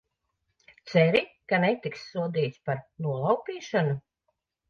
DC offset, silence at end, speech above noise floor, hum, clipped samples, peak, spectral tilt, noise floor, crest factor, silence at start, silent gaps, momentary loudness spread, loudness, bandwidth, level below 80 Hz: under 0.1%; 0.7 s; 52 dB; none; under 0.1%; -8 dBFS; -7 dB/octave; -79 dBFS; 20 dB; 0.85 s; none; 10 LU; -27 LUFS; 7 kHz; -70 dBFS